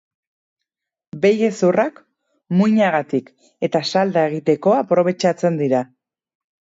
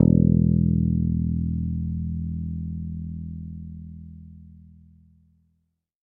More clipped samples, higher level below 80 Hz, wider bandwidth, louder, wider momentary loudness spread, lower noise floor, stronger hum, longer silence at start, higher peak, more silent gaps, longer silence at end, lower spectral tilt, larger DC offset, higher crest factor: neither; second, -68 dBFS vs -36 dBFS; first, 8 kHz vs 1 kHz; first, -18 LUFS vs -24 LUFS; second, 8 LU vs 22 LU; first, -82 dBFS vs -74 dBFS; neither; first, 1.15 s vs 0 s; about the same, -4 dBFS vs -2 dBFS; neither; second, 0.9 s vs 1.45 s; second, -6.5 dB/octave vs -15 dB/octave; neither; second, 16 dB vs 22 dB